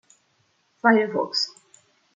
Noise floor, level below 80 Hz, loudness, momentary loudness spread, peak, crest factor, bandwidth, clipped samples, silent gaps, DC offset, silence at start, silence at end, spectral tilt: -67 dBFS; -76 dBFS; -22 LUFS; 7 LU; -2 dBFS; 22 dB; 9 kHz; under 0.1%; none; under 0.1%; 0.85 s; 0.65 s; -4 dB/octave